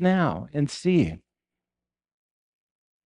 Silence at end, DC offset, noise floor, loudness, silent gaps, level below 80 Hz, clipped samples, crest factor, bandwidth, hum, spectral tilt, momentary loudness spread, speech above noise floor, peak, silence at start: 1.9 s; under 0.1%; under -90 dBFS; -25 LUFS; none; -56 dBFS; under 0.1%; 18 dB; 10.5 kHz; 60 Hz at -50 dBFS; -7 dB/octave; 6 LU; over 67 dB; -10 dBFS; 0 s